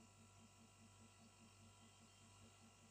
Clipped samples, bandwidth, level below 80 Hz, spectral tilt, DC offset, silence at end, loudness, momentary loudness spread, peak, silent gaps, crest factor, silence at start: under 0.1%; 15.5 kHz; -84 dBFS; -3.5 dB/octave; under 0.1%; 0 s; -67 LUFS; 1 LU; -54 dBFS; none; 12 dB; 0 s